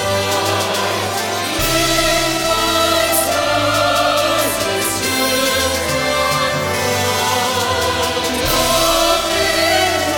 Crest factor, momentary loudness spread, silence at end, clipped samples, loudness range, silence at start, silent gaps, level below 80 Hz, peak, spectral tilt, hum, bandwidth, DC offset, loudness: 14 dB; 4 LU; 0 s; under 0.1%; 1 LU; 0 s; none; -36 dBFS; -2 dBFS; -2.5 dB/octave; none; 18 kHz; under 0.1%; -15 LUFS